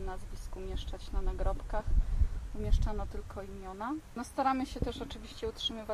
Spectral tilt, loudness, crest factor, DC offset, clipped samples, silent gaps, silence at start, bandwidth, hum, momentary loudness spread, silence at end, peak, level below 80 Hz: -6 dB/octave; -37 LUFS; 18 dB; under 0.1%; under 0.1%; none; 0 s; 12.5 kHz; none; 11 LU; 0 s; -16 dBFS; -34 dBFS